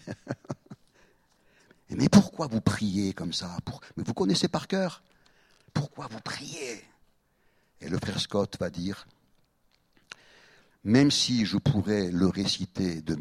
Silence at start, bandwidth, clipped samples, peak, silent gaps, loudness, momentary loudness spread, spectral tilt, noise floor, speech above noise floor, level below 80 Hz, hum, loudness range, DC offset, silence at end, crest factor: 0.05 s; 13.5 kHz; under 0.1%; -4 dBFS; none; -28 LUFS; 19 LU; -5 dB/octave; -69 dBFS; 41 dB; -56 dBFS; none; 8 LU; under 0.1%; 0 s; 24 dB